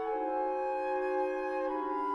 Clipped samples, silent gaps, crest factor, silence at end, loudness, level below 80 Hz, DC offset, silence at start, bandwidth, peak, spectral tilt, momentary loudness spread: under 0.1%; none; 12 dB; 0 s; -33 LUFS; -66 dBFS; under 0.1%; 0 s; 10.5 kHz; -22 dBFS; -5 dB/octave; 2 LU